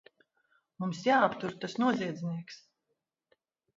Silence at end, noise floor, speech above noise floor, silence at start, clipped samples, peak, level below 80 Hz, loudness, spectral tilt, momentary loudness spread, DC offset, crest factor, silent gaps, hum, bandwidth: 1.2 s; -83 dBFS; 53 dB; 0.8 s; under 0.1%; -12 dBFS; -78 dBFS; -31 LUFS; -6 dB/octave; 15 LU; under 0.1%; 22 dB; none; none; 7.8 kHz